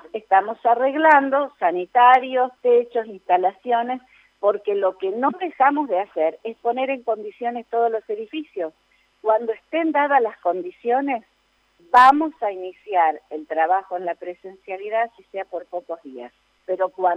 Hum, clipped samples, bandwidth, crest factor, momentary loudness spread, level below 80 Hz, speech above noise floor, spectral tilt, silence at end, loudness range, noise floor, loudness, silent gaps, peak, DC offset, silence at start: none; under 0.1%; 9.2 kHz; 18 dB; 17 LU; -70 dBFS; 43 dB; -5 dB/octave; 0 s; 7 LU; -64 dBFS; -21 LUFS; none; -4 dBFS; under 0.1%; 0.15 s